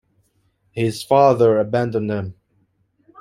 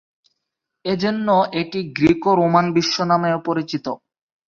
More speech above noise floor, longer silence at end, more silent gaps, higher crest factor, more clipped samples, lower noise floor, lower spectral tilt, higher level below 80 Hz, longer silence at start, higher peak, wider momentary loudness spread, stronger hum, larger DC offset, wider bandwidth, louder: second, 47 dB vs 61 dB; first, 0.9 s vs 0.5 s; neither; about the same, 18 dB vs 18 dB; neither; second, -64 dBFS vs -80 dBFS; about the same, -7 dB/octave vs -6 dB/octave; second, -60 dBFS vs -54 dBFS; about the same, 0.75 s vs 0.85 s; about the same, -2 dBFS vs -2 dBFS; first, 15 LU vs 11 LU; neither; neither; first, 15.5 kHz vs 7.4 kHz; about the same, -18 LUFS vs -19 LUFS